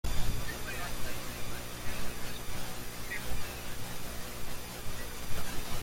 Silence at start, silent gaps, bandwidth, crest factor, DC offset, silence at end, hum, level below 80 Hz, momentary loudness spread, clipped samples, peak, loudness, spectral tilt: 0.05 s; none; 16.5 kHz; 16 dB; under 0.1%; 0 s; 60 Hz at -50 dBFS; -42 dBFS; 4 LU; under 0.1%; -14 dBFS; -40 LUFS; -3.5 dB/octave